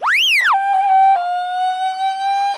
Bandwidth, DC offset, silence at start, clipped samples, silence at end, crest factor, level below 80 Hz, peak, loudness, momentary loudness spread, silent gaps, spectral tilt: 15.5 kHz; under 0.1%; 0 s; under 0.1%; 0 s; 8 dB; -72 dBFS; -6 dBFS; -15 LUFS; 8 LU; none; 2.5 dB/octave